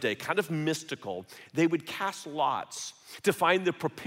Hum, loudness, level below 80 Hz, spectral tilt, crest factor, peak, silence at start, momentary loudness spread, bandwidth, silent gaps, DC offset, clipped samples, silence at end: none; -30 LUFS; -78 dBFS; -4.5 dB/octave; 20 dB; -12 dBFS; 0 s; 13 LU; 16 kHz; none; under 0.1%; under 0.1%; 0 s